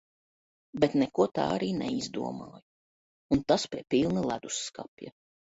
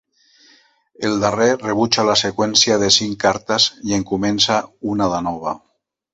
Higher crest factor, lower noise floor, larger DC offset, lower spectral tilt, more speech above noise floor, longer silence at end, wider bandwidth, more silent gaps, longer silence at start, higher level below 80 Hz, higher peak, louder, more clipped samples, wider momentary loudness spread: about the same, 22 dB vs 18 dB; first, under -90 dBFS vs -54 dBFS; neither; first, -5 dB/octave vs -3 dB/octave; first, over 61 dB vs 36 dB; about the same, 0.45 s vs 0.55 s; about the same, 8 kHz vs 8.4 kHz; first, 2.62-3.29 s, 4.88-4.97 s vs none; second, 0.75 s vs 1 s; second, -60 dBFS vs -50 dBFS; second, -10 dBFS vs 0 dBFS; second, -29 LUFS vs -17 LUFS; neither; first, 17 LU vs 10 LU